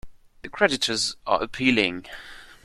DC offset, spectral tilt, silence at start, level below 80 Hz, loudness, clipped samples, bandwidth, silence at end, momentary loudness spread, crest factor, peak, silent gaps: under 0.1%; -3 dB/octave; 0.05 s; -52 dBFS; -23 LUFS; under 0.1%; 13.5 kHz; 0.1 s; 20 LU; 22 dB; -4 dBFS; none